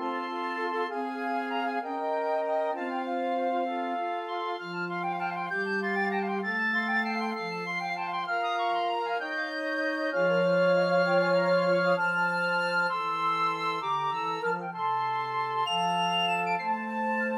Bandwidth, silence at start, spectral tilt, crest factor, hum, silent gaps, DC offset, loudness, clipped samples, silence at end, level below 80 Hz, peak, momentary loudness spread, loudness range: 12 kHz; 0 s; -5.5 dB/octave; 14 dB; none; none; under 0.1%; -28 LUFS; under 0.1%; 0 s; -86 dBFS; -14 dBFS; 7 LU; 5 LU